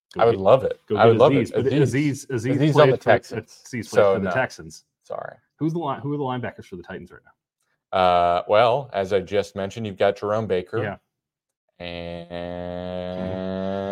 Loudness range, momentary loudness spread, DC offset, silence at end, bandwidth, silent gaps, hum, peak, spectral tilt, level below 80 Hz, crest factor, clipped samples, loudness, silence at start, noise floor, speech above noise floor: 11 LU; 18 LU; under 0.1%; 0 s; 12.5 kHz; 11.57-11.68 s; none; 0 dBFS; -6.5 dB/octave; -58 dBFS; 22 dB; under 0.1%; -21 LUFS; 0.15 s; -83 dBFS; 62 dB